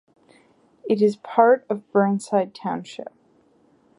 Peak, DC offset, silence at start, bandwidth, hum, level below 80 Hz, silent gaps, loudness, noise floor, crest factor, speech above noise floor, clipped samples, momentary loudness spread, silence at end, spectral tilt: -2 dBFS; under 0.1%; 0.85 s; 11.5 kHz; none; -74 dBFS; none; -21 LUFS; -59 dBFS; 20 dB; 38 dB; under 0.1%; 20 LU; 0.95 s; -6.5 dB/octave